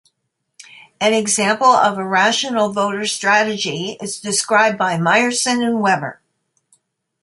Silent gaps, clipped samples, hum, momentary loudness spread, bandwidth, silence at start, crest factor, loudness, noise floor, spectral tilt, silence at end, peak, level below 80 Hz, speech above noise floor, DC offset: none; under 0.1%; none; 8 LU; 11.5 kHz; 0.6 s; 16 dB; -16 LUFS; -73 dBFS; -3 dB/octave; 1.1 s; -2 dBFS; -66 dBFS; 57 dB; under 0.1%